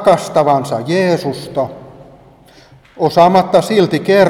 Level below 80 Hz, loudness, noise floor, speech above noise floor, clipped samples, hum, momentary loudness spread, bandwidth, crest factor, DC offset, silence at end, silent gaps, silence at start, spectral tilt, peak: -52 dBFS; -13 LUFS; -43 dBFS; 31 dB; under 0.1%; none; 11 LU; 16 kHz; 14 dB; under 0.1%; 0 s; none; 0 s; -6 dB/octave; 0 dBFS